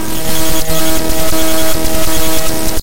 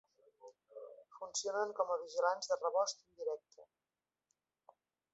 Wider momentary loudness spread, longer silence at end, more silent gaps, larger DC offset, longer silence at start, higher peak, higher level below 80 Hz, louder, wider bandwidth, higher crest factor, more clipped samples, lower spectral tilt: second, 2 LU vs 19 LU; second, 0 s vs 1.5 s; neither; first, 50% vs under 0.1%; second, 0 s vs 0.45 s; first, 0 dBFS vs -20 dBFS; first, -24 dBFS vs under -90 dBFS; first, -15 LUFS vs -38 LUFS; first, 17 kHz vs 8 kHz; second, 10 dB vs 22 dB; first, 0.3% vs under 0.1%; first, -3 dB/octave vs 1.5 dB/octave